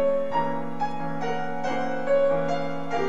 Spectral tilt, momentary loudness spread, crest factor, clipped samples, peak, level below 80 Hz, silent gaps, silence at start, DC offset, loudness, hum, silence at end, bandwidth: -6.5 dB/octave; 7 LU; 14 dB; under 0.1%; -12 dBFS; -60 dBFS; none; 0 s; 3%; -27 LUFS; none; 0 s; 8 kHz